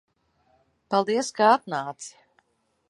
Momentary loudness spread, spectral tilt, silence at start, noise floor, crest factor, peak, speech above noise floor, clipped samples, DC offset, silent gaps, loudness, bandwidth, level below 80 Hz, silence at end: 19 LU; -4 dB/octave; 0.9 s; -71 dBFS; 22 dB; -6 dBFS; 48 dB; under 0.1%; under 0.1%; none; -23 LUFS; 11.5 kHz; -78 dBFS; 0.8 s